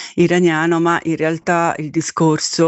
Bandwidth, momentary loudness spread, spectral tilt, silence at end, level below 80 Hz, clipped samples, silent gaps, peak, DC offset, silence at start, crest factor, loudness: 8.4 kHz; 5 LU; -5 dB/octave; 0 s; -58 dBFS; under 0.1%; none; -2 dBFS; under 0.1%; 0 s; 14 dB; -16 LUFS